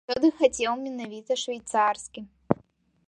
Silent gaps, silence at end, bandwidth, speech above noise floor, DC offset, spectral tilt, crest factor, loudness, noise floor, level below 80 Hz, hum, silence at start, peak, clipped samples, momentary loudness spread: none; 0.55 s; 11.5 kHz; 32 dB; under 0.1%; -4 dB/octave; 24 dB; -27 LUFS; -59 dBFS; -62 dBFS; none; 0.1 s; -4 dBFS; under 0.1%; 14 LU